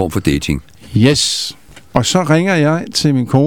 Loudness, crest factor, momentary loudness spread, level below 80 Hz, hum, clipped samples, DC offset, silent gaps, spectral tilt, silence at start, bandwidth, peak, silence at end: -14 LUFS; 14 dB; 9 LU; -36 dBFS; none; under 0.1%; 0.7%; none; -5 dB/octave; 0 s; 18 kHz; 0 dBFS; 0 s